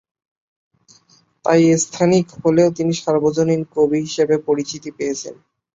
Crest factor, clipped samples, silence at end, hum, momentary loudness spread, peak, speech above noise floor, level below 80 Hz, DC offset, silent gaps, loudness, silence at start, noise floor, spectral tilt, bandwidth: 16 dB; under 0.1%; 0.4 s; none; 10 LU; -2 dBFS; 38 dB; -58 dBFS; under 0.1%; none; -18 LUFS; 1.45 s; -55 dBFS; -5.5 dB/octave; 8 kHz